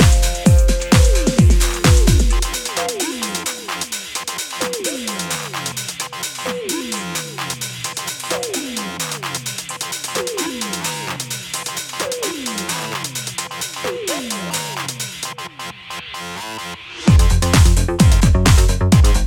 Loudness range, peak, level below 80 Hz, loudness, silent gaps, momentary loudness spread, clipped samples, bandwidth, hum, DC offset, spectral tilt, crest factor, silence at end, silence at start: 8 LU; 0 dBFS; -20 dBFS; -19 LUFS; none; 11 LU; under 0.1%; 18.5 kHz; none; under 0.1%; -4.5 dB/octave; 16 dB; 0 s; 0 s